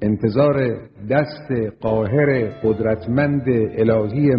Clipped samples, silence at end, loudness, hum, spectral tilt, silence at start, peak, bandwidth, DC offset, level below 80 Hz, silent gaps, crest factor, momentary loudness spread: under 0.1%; 0 s; -19 LUFS; none; -11.5 dB/octave; 0 s; -2 dBFS; 5.4 kHz; under 0.1%; -46 dBFS; none; 16 dB; 7 LU